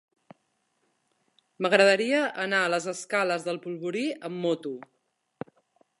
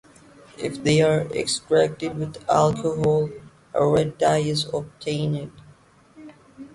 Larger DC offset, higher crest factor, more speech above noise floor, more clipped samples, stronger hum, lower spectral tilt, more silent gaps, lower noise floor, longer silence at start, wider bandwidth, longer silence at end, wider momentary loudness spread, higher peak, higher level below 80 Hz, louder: neither; first, 24 dB vs 18 dB; first, 48 dB vs 31 dB; neither; neither; second, -4 dB/octave vs -5.5 dB/octave; neither; first, -74 dBFS vs -53 dBFS; first, 1.6 s vs 0.6 s; about the same, 11.5 kHz vs 11.5 kHz; first, 1.2 s vs 0.05 s; first, 22 LU vs 11 LU; about the same, -4 dBFS vs -6 dBFS; second, -82 dBFS vs -54 dBFS; second, -26 LUFS vs -23 LUFS